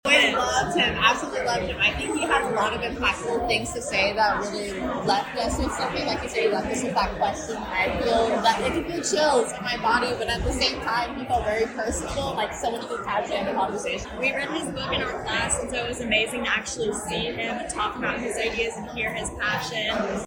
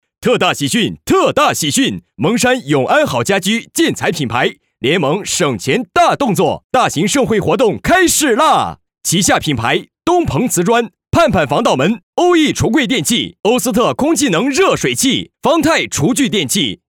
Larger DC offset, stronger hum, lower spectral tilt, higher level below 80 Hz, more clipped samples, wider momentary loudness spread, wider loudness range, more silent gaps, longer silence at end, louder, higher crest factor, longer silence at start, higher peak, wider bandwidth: neither; neither; about the same, -3 dB/octave vs -4 dB/octave; about the same, -42 dBFS vs -42 dBFS; neither; about the same, 7 LU vs 5 LU; about the same, 4 LU vs 2 LU; second, none vs 6.64-6.70 s, 12.03-12.13 s; second, 0 s vs 0.15 s; second, -24 LUFS vs -14 LUFS; first, 20 dB vs 12 dB; second, 0.05 s vs 0.2 s; about the same, -4 dBFS vs -2 dBFS; about the same, 17 kHz vs 18.5 kHz